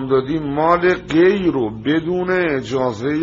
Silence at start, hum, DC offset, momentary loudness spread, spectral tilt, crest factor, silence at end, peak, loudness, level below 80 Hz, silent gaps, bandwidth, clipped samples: 0 s; none; under 0.1%; 6 LU; -5 dB/octave; 14 dB; 0 s; -2 dBFS; -17 LUFS; -46 dBFS; none; 7.6 kHz; under 0.1%